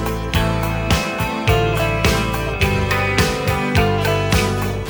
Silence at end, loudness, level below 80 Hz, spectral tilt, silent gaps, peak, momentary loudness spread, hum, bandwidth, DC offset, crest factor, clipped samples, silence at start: 0 s; -18 LUFS; -26 dBFS; -5 dB/octave; none; -2 dBFS; 3 LU; none; over 20 kHz; under 0.1%; 16 dB; under 0.1%; 0 s